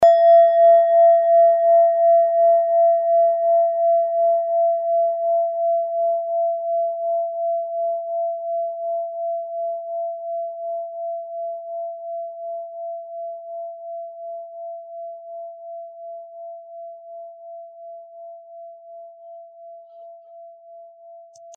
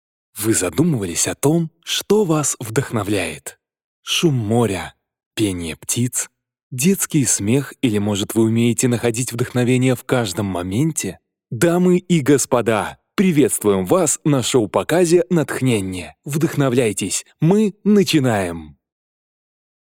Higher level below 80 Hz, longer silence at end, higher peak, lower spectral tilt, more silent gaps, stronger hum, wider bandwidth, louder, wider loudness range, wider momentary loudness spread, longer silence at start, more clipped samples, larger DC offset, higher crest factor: second, -74 dBFS vs -56 dBFS; second, 0 s vs 1.15 s; second, -6 dBFS vs 0 dBFS; second, 3.5 dB/octave vs -5 dB/octave; second, none vs 3.84-4.03 s, 5.26-5.31 s, 6.63-6.71 s; neither; second, 3.7 kHz vs 17 kHz; about the same, -19 LUFS vs -18 LUFS; first, 24 LU vs 4 LU; first, 24 LU vs 10 LU; second, 0 s vs 0.35 s; neither; neither; about the same, 14 dB vs 18 dB